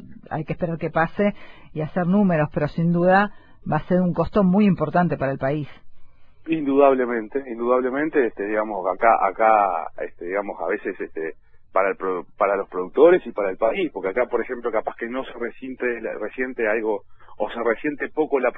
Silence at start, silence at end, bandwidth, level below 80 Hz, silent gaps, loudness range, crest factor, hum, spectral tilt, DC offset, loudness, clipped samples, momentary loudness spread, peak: 0 s; 0 s; 5 kHz; -48 dBFS; none; 5 LU; 20 dB; none; -10.5 dB/octave; under 0.1%; -22 LUFS; under 0.1%; 13 LU; -2 dBFS